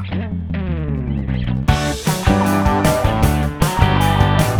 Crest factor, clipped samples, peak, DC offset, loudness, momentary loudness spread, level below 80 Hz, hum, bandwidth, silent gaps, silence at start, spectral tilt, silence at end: 16 dB; under 0.1%; 0 dBFS; under 0.1%; -17 LUFS; 8 LU; -24 dBFS; none; over 20 kHz; none; 0 s; -6 dB/octave; 0 s